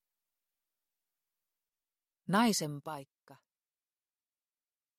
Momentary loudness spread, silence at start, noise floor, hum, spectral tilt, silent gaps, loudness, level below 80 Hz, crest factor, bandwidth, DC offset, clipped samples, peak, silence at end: 18 LU; 2.3 s; under -90 dBFS; none; -4 dB/octave; none; -32 LUFS; -84 dBFS; 22 dB; 15.5 kHz; under 0.1%; under 0.1%; -18 dBFS; 1.65 s